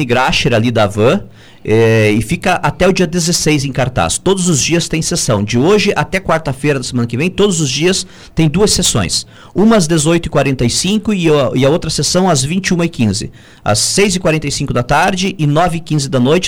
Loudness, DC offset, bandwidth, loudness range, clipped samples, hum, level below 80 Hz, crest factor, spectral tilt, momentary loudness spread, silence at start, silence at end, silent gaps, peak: -13 LUFS; under 0.1%; 19 kHz; 1 LU; under 0.1%; none; -34 dBFS; 12 dB; -4.5 dB/octave; 5 LU; 0 s; 0 s; none; 0 dBFS